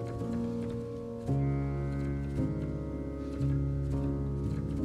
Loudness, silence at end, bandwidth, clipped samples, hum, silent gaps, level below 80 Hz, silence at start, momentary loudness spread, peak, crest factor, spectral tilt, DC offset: -34 LUFS; 0 s; 9 kHz; under 0.1%; none; none; -40 dBFS; 0 s; 7 LU; -20 dBFS; 12 dB; -9.5 dB/octave; under 0.1%